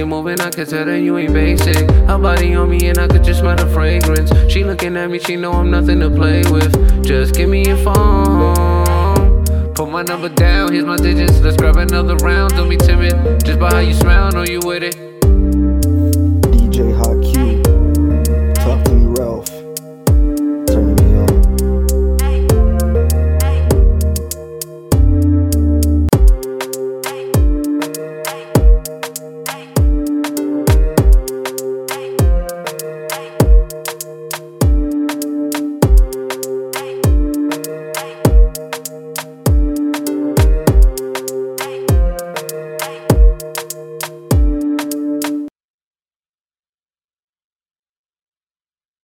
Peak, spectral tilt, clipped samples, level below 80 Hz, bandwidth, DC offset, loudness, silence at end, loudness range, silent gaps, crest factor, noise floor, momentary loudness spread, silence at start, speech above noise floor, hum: 0 dBFS; -6 dB/octave; under 0.1%; -14 dBFS; 17 kHz; under 0.1%; -14 LUFS; 3.55 s; 5 LU; none; 12 dB; under -90 dBFS; 12 LU; 0 s; over 79 dB; none